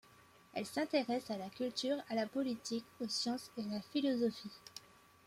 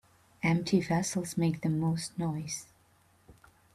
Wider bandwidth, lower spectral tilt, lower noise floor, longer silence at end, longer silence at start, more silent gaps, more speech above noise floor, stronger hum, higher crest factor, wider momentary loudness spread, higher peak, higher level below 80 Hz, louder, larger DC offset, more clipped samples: first, 16 kHz vs 13.5 kHz; second, -4 dB/octave vs -5.5 dB/octave; about the same, -64 dBFS vs -65 dBFS; about the same, 0.5 s vs 0.4 s; about the same, 0.55 s vs 0.45 s; neither; second, 25 dB vs 35 dB; neither; about the same, 20 dB vs 20 dB; first, 13 LU vs 8 LU; second, -20 dBFS vs -14 dBFS; second, -80 dBFS vs -62 dBFS; second, -39 LUFS vs -31 LUFS; neither; neither